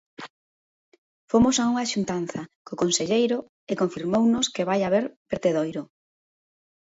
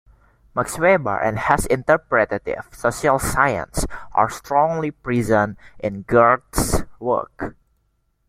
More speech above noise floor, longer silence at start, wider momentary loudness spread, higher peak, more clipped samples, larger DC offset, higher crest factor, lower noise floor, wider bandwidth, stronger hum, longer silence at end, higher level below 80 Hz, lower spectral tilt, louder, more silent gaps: first, over 66 dB vs 47 dB; second, 0.2 s vs 0.55 s; first, 16 LU vs 11 LU; second, -8 dBFS vs 0 dBFS; neither; neither; about the same, 18 dB vs 20 dB; first, under -90 dBFS vs -67 dBFS; second, 8 kHz vs 16.5 kHz; neither; first, 1.1 s vs 0.8 s; second, -58 dBFS vs -36 dBFS; about the same, -4.5 dB/octave vs -5 dB/octave; second, -24 LUFS vs -20 LUFS; first, 0.30-0.92 s, 0.98-1.28 s, 2.55-2.65 s, 3.49-3.67 s, 5.17-5.25 s vs none